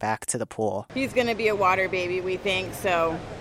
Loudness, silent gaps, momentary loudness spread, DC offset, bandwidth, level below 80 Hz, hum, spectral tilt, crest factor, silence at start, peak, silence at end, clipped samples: -25 LUFS; none; 7 LU; under 0.1%; 16 kHz; -52 dBFS; none; -4 dB/octave; 16 dB; 0 s; -10 dBFS; 0 s; under 0.1%